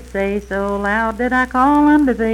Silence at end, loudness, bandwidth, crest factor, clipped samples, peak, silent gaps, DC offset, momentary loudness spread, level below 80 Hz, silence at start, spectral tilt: 0 s; -16 LUFS; 12 kHz; 14 dB; under 0.1%; -2 dBFS; none; under 0.1%; 9 LU; -36 dBFS; 0 s; -6.5 dB/octave